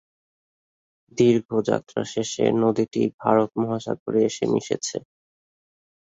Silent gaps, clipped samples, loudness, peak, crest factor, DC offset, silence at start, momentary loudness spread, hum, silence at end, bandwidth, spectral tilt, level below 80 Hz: 1.45-1.49 s, 3.14-3.18 s, 4.00-4.06 s; under 0.1%; -23 LUFS; -4 dBFS; 20 dB; under 0.1%; 1.15 s; 8 LU; none; 1.1 s; 8 kHz; -5.5 dB/octave; -62 dBFS